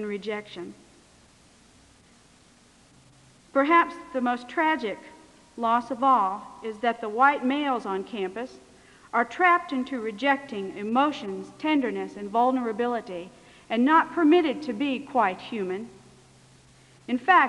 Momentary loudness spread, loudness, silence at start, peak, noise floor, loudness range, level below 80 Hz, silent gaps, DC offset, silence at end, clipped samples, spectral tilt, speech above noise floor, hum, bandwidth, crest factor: 15 LU; -25 LUFS; 0 s; -6 dBFS; -57 dBFS; 3 LU; -68 dBFS; none; under 0.1%; 0 s; under 0.1%; -5 dB/octave; 32 dB; none; 11 kHz; 20 dB